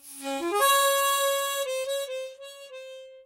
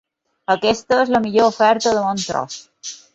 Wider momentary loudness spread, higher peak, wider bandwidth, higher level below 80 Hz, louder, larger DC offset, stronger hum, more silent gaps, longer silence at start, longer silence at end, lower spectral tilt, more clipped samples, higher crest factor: first, 22 LU vs 17 LU; second, -10 dBFS vs -2 dBFS; first, 16 kHz vs 8.2 kHz; second, -78 dBFS vs -54 dBFS; second, -25 LUFS vs -17 LUFS; neither; neither; neither; second, 0.05 s vs 0.5 s; second, 0.05 s vs 0.2 s; second, 1.5 dB/octave vs -3.5 dB/octave; neither; about the same, 16 dB vs 16 dB